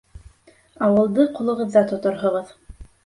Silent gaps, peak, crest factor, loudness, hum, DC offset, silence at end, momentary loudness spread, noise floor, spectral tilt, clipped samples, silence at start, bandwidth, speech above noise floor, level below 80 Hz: none; -4 dBFS; 18 dB; -20 LUFS; none; under 0.1%; 0.2 s; 7 LU; -53 dBFS; -8 dB/octave; under 0.1%; 0.15 s; 11.5 kHz; 34 dB; -50 dBFS